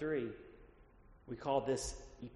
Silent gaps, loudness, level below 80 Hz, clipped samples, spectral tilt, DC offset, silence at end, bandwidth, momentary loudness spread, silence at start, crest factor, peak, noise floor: none; -40 LUFS; -58 dBFS; under 0.1%; -4.5 dB/octave; under 0.1%; 0 s; 11 kHz; 18 LU; 0 s; 20 dB; -20 dBFS; -62 dBFS